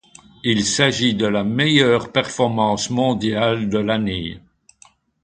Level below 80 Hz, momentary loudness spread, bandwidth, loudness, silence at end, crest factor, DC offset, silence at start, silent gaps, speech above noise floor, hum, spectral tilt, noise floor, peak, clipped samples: -48 dBFS; 6 LU; 9.4 kHz; -18 LUFS; 0.85 s; 20 dB; under 0.1%; 0.45 s; none; 35 dB; none; -4.5 dB/octave; -53 dBFS; 0 dBFS; under 0.1%